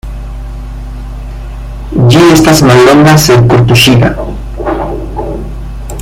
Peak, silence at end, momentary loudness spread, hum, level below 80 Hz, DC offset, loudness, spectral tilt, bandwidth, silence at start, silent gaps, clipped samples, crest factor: 0 dBFS; 0 s; 20 LU; none; -20 dBFS; under 0.1%; -6 LUFS; -5.5 dB/octave; 17 kHz; 0.05 s; none; 2%; 8 dB